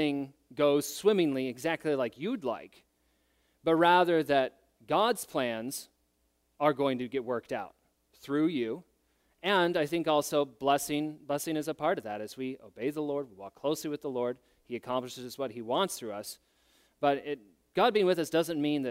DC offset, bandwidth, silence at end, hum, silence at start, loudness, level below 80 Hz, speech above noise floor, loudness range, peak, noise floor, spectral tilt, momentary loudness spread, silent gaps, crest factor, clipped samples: under 0.1%; 16 kHz; 0 s; none; 0 s; -31 LUFS; -72 dBFS; 44 dB; 6 LU; -10 dBFS; -74 dBFS; -4.5 dB/octave; 13 LU; none; 22 dB; under 0.1%